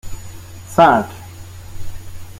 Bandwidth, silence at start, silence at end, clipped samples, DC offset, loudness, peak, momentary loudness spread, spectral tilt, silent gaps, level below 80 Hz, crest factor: 16.5 kHz; 0.05 s; 0 s; under 0.1%; under 0.1%; -14 LUFS; 0 dBFS; 25 LU; -5.5 dB/octave; none; -38 dBFS; 18 dB